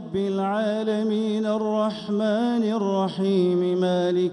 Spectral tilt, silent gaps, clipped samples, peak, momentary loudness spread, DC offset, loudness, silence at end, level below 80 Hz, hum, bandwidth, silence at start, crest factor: -7.5 dB/octave; none; under 0.1%; -12 dBFS; 3 LU; under 0.1%; -23 LUFS; 0 s; -66 dBFS; none; 10.5 kHz; 0 s; 12 dB